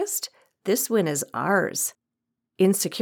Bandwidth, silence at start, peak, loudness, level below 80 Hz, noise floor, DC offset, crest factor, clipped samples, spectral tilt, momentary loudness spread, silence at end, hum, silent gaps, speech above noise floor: over 20 kHz; 0 s; -8 dBFS; -24 LUFS; -82 dBFS; -83 dBFS; under 0.1%; 18 dB; under 0.1%; -4 dB/octave; 8 LU; 0 s; none; none; 59 dB